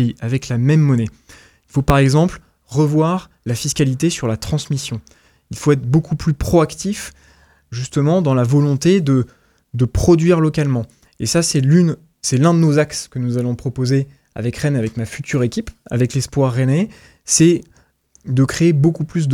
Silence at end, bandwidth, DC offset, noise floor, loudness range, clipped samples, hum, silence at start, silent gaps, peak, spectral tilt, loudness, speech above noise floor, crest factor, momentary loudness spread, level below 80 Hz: 0 s; 15 kHz; under 0.1%; -54 dBFS; 4 LU; under 0.1%; none; 0 s; none; 0 dBFS; -6 dB/octave; -17 LUFS; 38 dB; 16 dB; 12 LU; -38 dBFS